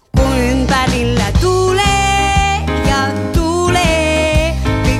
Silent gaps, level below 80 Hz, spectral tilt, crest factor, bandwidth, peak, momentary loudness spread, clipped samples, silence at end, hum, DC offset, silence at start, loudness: none; -20 dBFS; -5 dB/octave; 12 dB; 15 kHz; 0 dBFS; 3 LU; under 0.1%; 0 s; none; under 0.1%; 0.15 s; -13 LUFS